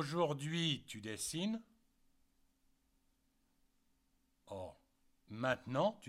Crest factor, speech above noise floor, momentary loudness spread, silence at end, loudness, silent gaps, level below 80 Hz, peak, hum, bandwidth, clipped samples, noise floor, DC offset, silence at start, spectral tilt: 22 dB; 38 dB; 13 LU; 0 s; -40 LUFS; none; -74 dBFS; -22 dBFS; none; 16 kHz; under 0.1%; -78 dBFS; under 0.1%; 0 s; -4.5 dB/octave